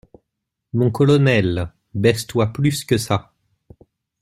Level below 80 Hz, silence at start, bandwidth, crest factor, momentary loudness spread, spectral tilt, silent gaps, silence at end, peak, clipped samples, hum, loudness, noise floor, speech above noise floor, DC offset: -48 dBFS; 0.75 s; 15 kHz; 18 dB; 10 LU; -6 dB/octave; none; 1 s; -2 dBFS; under 0.1%; none; -19 LUFS; -79 dBFS; 62 dB; under 0.1%